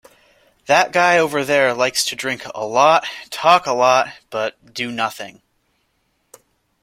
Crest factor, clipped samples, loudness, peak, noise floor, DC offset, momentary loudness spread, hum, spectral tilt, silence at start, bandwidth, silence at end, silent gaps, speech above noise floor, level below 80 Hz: 18 dB; under 0.1%; -17 LUFS; 0 dBFS; -67 dBFS; under 0.1%; 12 LU; none; -2.5 dB/octave; 0.7 s; 16.5 kHz; 1.5 s; none; 49 dB; -62 dBFS